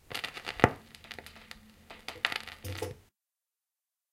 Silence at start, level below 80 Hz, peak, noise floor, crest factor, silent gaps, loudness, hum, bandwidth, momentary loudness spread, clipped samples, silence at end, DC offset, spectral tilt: 0.1 s; -56 dBFS; -2 dBFS; under -90 dBFS; 36 dB; none; -33 LUFS; none; 16.5 kHz; 23 LU; under 0.1%; 1.1 s; under 0.1%; -4.5 dB/octave